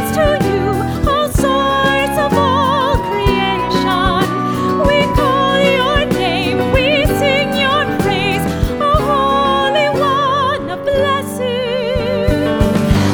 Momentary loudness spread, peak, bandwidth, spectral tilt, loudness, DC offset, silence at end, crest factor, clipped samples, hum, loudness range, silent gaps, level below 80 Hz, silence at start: 4 LU; 0 dBFS; over 20 kHz; -5.5 dB/octave; -14 LUFS; under 0.1%; 0 s; 14 dB; under 0.1%; none; 1 LU; none; -26 dBFS; 0 s